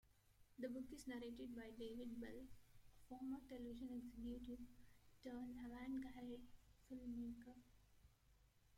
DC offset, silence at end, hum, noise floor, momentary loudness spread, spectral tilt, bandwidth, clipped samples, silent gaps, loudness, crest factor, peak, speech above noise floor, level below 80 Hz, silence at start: under 0.1%; 0 s; 50 Hz at -75 dBFS; -75 dBFS; 10 LU; -6 dB/octave; 16.5 kHz; under 0.1%; none; -54 LUFS; 16 dB; -40 dBFS; 22 dB; -70 dBFS; 0.05 s